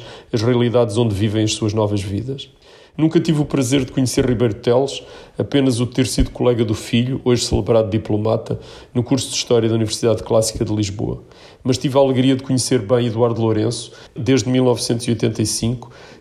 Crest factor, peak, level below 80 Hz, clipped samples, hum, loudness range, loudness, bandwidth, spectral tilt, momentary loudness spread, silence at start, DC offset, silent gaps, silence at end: 14 dB; -4 dBFS; -38 dBFS; under 0.1%; none; 1 LU; -18 LUFS; 14.5 kHz; -5.5 dB/octave; 9 LU; 0 s; under 0.1%; none; 0.05 s